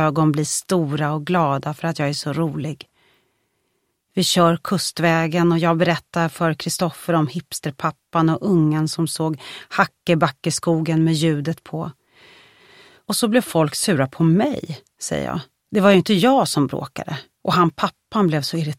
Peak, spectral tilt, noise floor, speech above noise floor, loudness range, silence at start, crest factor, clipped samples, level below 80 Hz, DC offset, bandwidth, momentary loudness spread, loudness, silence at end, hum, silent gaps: 0 dBFS; -5.5 dB/octave; -71 dBFS; 51 dB; 4 LU; 0 s; 20 dB; under 0.1%; -58 dBFS; under 0.1%; 15.5 kHz; 12 LU; -20 LUFS; 0.05 s; none; none